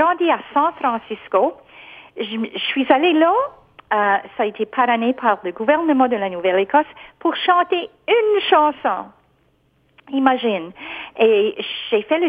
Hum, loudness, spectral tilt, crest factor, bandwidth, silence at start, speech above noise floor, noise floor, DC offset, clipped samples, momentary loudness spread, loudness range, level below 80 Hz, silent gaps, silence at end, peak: none; -18 LUFS; -7 dB/octave; 18 dB; 5 kHz; 0 s; 42 dB; -60 dBFS; under 0.1%; under 0.1%; 11 LU; 2 LU; -64 dBFS; none; 0 s; 0 dBFS